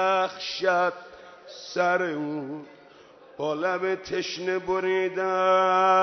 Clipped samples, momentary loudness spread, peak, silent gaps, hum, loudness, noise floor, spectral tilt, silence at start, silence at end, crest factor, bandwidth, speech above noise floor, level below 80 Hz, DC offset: under 0.1%; 17 LU; -10 dBFS; none; none; -25 LUFS; -51 dBFS; -4.5 dB/octave; 0 s; 0 s; 16 dB; 6.4 kHz; 26 dB; -66 dBFS; under 0.1%